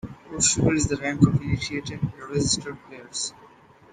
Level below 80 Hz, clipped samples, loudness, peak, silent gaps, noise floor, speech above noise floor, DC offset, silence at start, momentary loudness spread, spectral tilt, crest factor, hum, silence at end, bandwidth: -44 dBFS; under 0.1%; -24 LUFS; -2 dBFS; none; -52 dBFS; 28 dB; under 0.1%; 0.05 s; 13 LU; -4 dB/octave; 22 dB; none; 0.45 s; 10 kHz